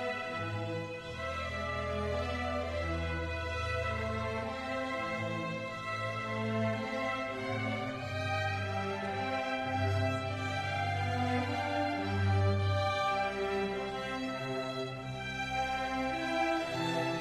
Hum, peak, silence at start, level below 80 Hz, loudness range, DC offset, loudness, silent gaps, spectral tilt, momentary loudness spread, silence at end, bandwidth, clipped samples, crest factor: none; -20 dBFS; 0 s; -52 dBFS; 3 LU; under 0.1%; -34 LUFS; none; -6 dB/octave; 6 LU; 0 s; 12.5 kHz; under 0.1%; 14 dB